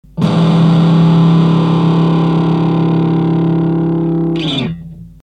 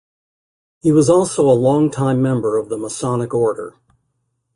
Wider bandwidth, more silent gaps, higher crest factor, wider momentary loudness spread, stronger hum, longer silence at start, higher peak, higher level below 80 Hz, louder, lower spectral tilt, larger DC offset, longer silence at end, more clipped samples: second, 6 kHz vs 11.5 kHz; neither; second, 10 dB vs 16 dB; second, 6 LU vs 9 LU; first, 50 Hz at -40 dBFS vs none; second, 0.15 s vs 0.85 s; about the same, -2 dBFS vs -2 dBFS; first, -40 dBFS vs -54 dBFS; first, -12 LUFS vs -16 LUFS; first, -8.5 dB/octave vs -7 dB/octave; neither; second, 0.15 s vs 0.85 s; neither